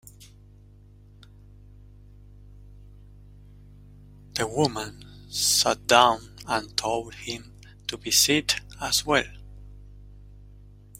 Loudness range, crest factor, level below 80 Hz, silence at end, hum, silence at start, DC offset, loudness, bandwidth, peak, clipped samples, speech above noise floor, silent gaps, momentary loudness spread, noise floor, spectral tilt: 10 LU; 26 dB; -50 dBFS; 0.55 s; 50 Hz at -45 dBFS; 0.2 s; under 0.1%; -24 LUFS; 16 kHz; -2 dBFS; under 0.1%; 27 dB; none; 17 LU; -51 dBFS; -2 dB/octave